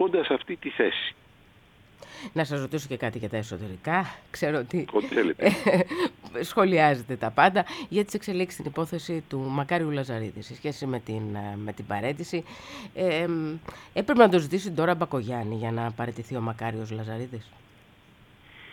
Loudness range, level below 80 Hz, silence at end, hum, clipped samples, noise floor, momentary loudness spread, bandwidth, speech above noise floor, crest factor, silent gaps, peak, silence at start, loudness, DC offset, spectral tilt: 8 LU; -62 dBFS; 0 s; none; under 0.1%; -56 dBFS; 13 LU; 18.5 kHz; 29 dB; 24 dB; none; -2 dBFS; 0 s; -27 LUFS; under 0.1%; -6 dB/octave